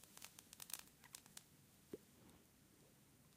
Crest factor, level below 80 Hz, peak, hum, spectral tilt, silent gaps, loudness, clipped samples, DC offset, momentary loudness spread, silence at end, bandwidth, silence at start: 38 dB; -84 dBFS; -24 dBFS; none; -2 dB/octave; none; -58 LUFS; under 0.1%; under 0.1%; 17 LU; 0 s; 16 kHz; 0 s